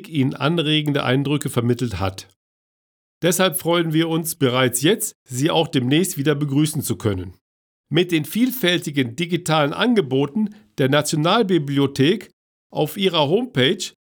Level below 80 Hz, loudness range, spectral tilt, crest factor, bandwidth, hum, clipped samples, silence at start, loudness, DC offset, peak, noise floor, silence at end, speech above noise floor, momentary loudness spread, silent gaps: -60 dBFS; 2 LU; -5 dB/octave; 16 dB; over 20 kHz; none; under 0.1%; 0 s; -20 LUFS; under 0.1%; -4 dBFS; under -90 dBFS; 0.3 s; over 70 dB; 7 LU; 2.36-3.21 s, 5.15-5.26 s, 7.41-7.84 s, 12.33-12.70 s